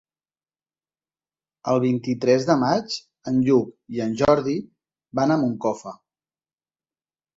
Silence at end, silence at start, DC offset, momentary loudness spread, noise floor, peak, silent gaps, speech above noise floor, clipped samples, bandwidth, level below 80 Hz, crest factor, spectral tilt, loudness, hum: 1.4 s; 1.65 s; under 0.1%; 12 LU; under -90 dBFS; -4 dBFS; none; over 69 dB; under 0.1%; 7.8 kHz; -58 dBFS; 20 dB; -6.5 dB/octave; -22 LUFS; none